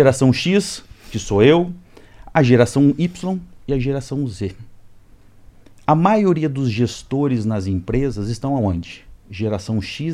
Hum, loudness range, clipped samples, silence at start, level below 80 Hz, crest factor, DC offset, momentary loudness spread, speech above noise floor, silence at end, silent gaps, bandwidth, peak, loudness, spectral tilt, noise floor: none; 5 LU; under 0.1%; 0 s; -40 dBFS; 18 dB; under 0.1%; 14 LU; 28 dB; 0 s; none; 13 kHz; 0 dBFS; -19 LUFS; -6.5 dB/octave; -45 dBFS